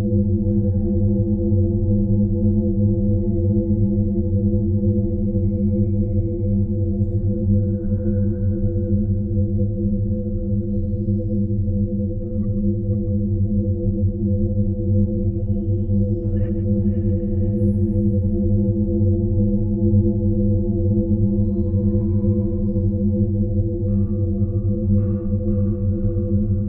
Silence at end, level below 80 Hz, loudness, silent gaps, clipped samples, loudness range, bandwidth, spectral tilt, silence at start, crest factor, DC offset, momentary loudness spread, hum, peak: 0 s; -28 dBFS; -21 LUFS; none; under 0.1%; 3 LU; 1.2 kHz; -15.5 dB/octave; 0 s; 12 dB; under 0.1%; 3 LU; none; -6 dBFS